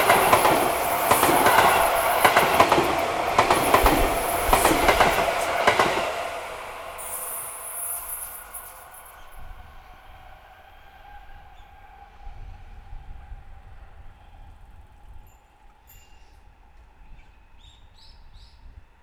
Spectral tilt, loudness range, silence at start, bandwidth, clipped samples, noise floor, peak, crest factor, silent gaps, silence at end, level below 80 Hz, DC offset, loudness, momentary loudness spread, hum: -3 dB/octave; 16 LU; 0 s; over 20 kHz; under 0.1%; -53 dBFS; 0 dBFS; 24 dB; none; 0.35 s; -40 dBFS; under 0.1%; -20 LUFS; 18 LU; none